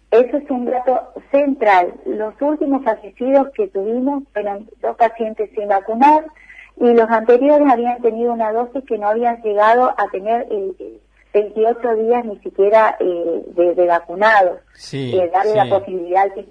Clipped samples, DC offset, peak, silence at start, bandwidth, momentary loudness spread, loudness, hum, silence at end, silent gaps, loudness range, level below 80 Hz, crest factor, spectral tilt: under 0.1%; under 0.1%; -2 dBFS; 0.1 s; 9.6 kHz; 11 LU; -16 LUFS; none; 0.1 s; none; 4 LU; -56 dBFS; 14 dB; -6.5 dB/octave